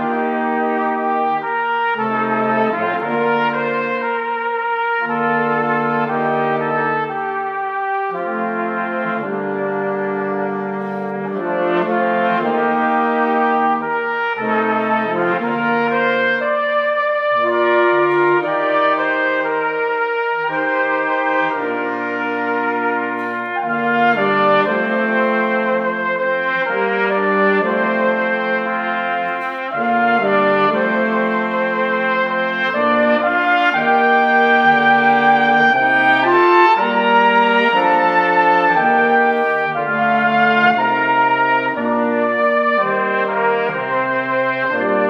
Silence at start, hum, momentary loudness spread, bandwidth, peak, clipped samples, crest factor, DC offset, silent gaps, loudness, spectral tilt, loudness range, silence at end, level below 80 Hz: 0 s; none; 8 LU; 7.2 kHz; 0 dBFS; under 0.1%; 16 dB; under 0.1%; none; -16 LUFS; -7 dB/octave; 6 LU; 0 s; -72 dBFS